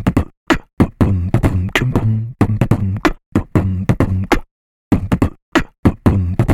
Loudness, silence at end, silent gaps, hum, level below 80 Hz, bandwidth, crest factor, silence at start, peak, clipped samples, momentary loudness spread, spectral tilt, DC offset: -17 LUFS; 0 s; 0.37-0.47 s, 0.73-0.77 s, 3.26-3.32 s, 4.51-4.91 s, 5.42-5.52 s, 5.78-5.83 s; none; -26 dBFS; 15 kHz; 16 dB; 0 s; 0 dBFS; under 0.1%; 4 LU; -7 dB/octave; 0.2%